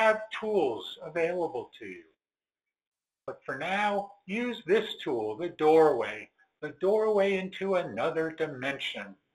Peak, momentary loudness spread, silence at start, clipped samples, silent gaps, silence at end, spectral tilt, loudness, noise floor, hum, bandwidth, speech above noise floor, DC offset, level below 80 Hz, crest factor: -10 dBFS; 17 LU; 0 s; under 0.1%; 2.87-2.92 s; 0.2 s; -5.5 dB/octave; -29 LUFS; under -90 dBFS; none; 12 kHz; over 61 dB; under 0.1%; -72 dBFS; 20 dB